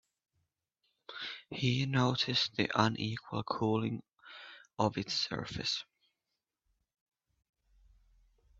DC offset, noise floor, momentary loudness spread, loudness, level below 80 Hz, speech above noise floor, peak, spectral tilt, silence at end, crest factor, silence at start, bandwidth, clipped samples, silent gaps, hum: under 0.1%; -88 dBFS; 19 LU; -33 LUFS; -68 dBFS; 55 dB; -10 dBFS; -5 dB/octave; 2.75 s; 26 dB; 1.1 s; 7.8 kHz; under 0.1%; none; none